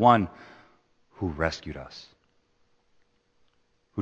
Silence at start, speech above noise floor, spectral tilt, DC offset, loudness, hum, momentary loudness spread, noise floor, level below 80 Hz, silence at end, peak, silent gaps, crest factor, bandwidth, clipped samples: 0 s; 43 dB; -6.5 dB/octave; under 0.1%; -28 LUFS; none; 22 LU; -68 dBFS; -50 dBFS; 0 s; -4 dBFS; none; 26 dB; 8.2 kHz; under 0.1%